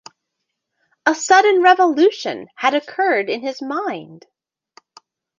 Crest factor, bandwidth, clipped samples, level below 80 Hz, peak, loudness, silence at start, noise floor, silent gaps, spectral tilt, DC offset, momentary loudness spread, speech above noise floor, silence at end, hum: 18 dB; 9.2 kHz; under 0.1%; -72 dBFS; -2 dBFS; -17 LUFS; 1.05 s; -78 dBFS; none; -2.5 dB/octave; under 0.1%; 14 LU; 61 dB; 1.2 s; none